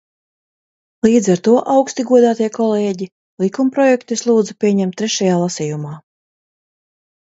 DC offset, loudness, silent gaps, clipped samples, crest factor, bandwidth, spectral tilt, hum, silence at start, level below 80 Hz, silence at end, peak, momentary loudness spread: under 0.1%; -15 LUFS; 3.12-3.37 s; under 0.1%; 16 dB; 8 kHz; -5.5 dB/octave; none; 1.05 s; -60 dBFS; 1.25 s; 0 dBFS; 10 LU